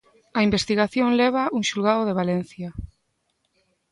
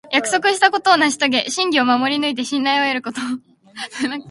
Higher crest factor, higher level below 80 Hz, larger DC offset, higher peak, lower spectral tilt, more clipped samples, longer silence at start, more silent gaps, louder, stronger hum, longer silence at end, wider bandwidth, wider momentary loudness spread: about the same, 16 dB vs 18 dB; first, -48 dBFS vs -66 dBFS; neither; second, -6 dBFS vs 0 dBFS; first, -5 dB/octave vs -2 dB/octave; neither; first, 0.35 s vs 0.05 s; neither; second, -22 LUFS vs -17 LUFS; neither; first, 1.05 s vs 0 s; about the same, 11.5 kHz vs 11.5 kHz; first, 15 LU vs 12 LU